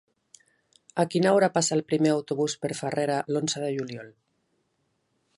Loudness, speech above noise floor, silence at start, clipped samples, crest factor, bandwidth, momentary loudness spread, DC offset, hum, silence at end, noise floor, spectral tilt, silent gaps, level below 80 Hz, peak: -26 LUFS; 49 dB; 0.95 s; under 0.1%; 20 dB; 11.5 kHz; 11 LU; under 0.1%; none; 1.3 s; -74 dBFS; -4.5 dB/octave; none; -74 dBFS; -8 dBFS